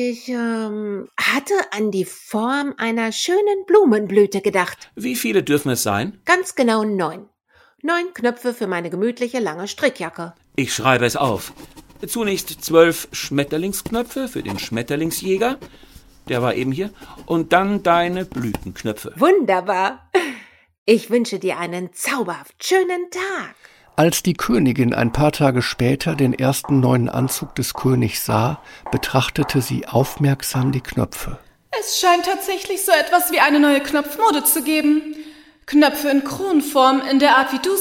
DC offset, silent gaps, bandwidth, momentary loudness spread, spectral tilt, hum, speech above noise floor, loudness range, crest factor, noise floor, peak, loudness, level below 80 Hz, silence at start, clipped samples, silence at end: under 0.1%; 20.78-20.86 s; 17 kHz; 11 LU; -4.5 dB/octave; none; 37 dB; 5 LU; 18 dB; -56 dBFS; 0 dBFS; -19 LUFS; -46 dBFS; 0 s; under 0.1%; 0 s